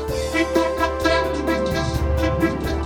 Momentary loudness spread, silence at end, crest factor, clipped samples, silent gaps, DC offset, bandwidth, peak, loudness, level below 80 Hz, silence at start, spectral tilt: 3 LU; 0 s; 16 dB; under 0.1%; none; under 0.1%; 18 kHz; -4 dBFS; -21 LUFS; -28 dBFS; 0 s; -5.5 dB/octave